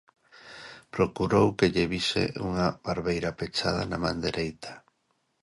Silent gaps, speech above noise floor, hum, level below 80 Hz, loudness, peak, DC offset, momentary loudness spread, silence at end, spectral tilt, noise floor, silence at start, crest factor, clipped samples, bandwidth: none; 47 dB; none; -50 dBFS; -27 LUFS; -8 dBFS; under 0.1%; 20 LU; 0.65 s; -5.5 dB/octave; -74 dBFS; 0.45 s; 20 dB; under 0.1%; 11.5 kHz